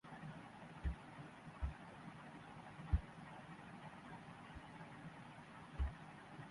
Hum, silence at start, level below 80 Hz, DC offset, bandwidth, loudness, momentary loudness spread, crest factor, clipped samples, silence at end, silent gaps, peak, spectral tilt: none; 0.05 s; -50 dBFS; under 0.1%; 11.5 kHz; -51 LUFS; 12 LU; 26 dB; under 0.1%; 0 s; none; -24 dBFS; -7 dB/octave